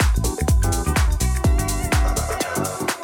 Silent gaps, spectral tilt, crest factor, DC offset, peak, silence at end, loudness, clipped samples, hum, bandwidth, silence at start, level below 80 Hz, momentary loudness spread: none; -4.5 dB/octave; 14 dB; under 0.1%; -6 dBFS; 0 s; -21 LUFS; under 0.1%; none; 17.5 kHz; 0 s; -22 dBFS; 4 LU